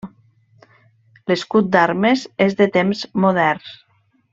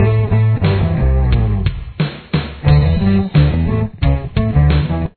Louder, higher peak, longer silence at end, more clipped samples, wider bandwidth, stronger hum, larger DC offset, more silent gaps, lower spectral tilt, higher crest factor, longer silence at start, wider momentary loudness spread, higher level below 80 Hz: about the same, -17 LUFS vs -15 LUFS; about the same, 0 dBFS vs 0 dBFS; first, 0.6 s vs 0.05 s; neither; first, 7.8 kHz vs 4.5 kHz; neither; neither; neither; second, -6.5 dB/octave vs -11.5 dB/octave; about the same, 18 dB vs 14 dB; about the same, 0.05 s vs 0 s; first, 13 LU vs 8 LU; second, -60 dBFS vs -20 dBFS